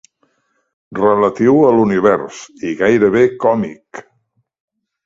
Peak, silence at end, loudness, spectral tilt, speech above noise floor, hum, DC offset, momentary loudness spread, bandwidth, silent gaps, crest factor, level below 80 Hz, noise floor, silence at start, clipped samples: 0 dBFS; 1.05 s; -13 LUFS; -7 dB/octave; 51 dB; none; under 0.1%; 18 LU; 7.8 kHz; none; 16 dB; -54 dBFS; -64 dBFS; 0.9 s; under 0.1%